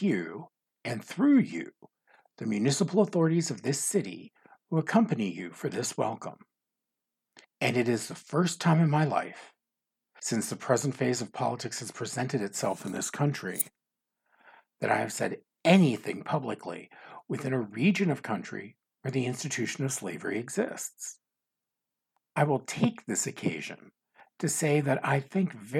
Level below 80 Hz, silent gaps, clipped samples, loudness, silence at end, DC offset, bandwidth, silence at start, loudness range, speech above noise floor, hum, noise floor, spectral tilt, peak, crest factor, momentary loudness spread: -82 dBFS; none; under 0.1%; -29 LUFS; 0 s; under 0.1%; 19 kHz; 0 s; 5 LU; 59 dB; none; -88 dBFS; -5 dB/octave; -8 dBFS; 22 dB; 15 LU